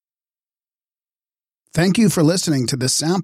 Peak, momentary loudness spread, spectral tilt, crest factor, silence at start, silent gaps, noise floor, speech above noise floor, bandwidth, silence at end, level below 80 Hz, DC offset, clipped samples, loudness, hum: -6 dBFS; 5 LU; -4.5 dB/octave; 14 dB; 1.75 s; none; under -90 dBFS; over 73 dB; 16 kHz; 0 s; -54 dBFS; under 0.1%; under 0.1%; -17 LUFS; none